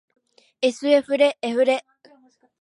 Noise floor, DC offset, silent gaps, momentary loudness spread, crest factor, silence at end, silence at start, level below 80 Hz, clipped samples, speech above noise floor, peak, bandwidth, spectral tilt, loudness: -57 dBFS; under 0.1%; none; 6 LU; 18 dB; 0.8 s; 0.6 s; -78 dBFS; under 0.1%; 37 dB; -4 dBFS; 11 kHz; -3 dB/octave; -21 LUFS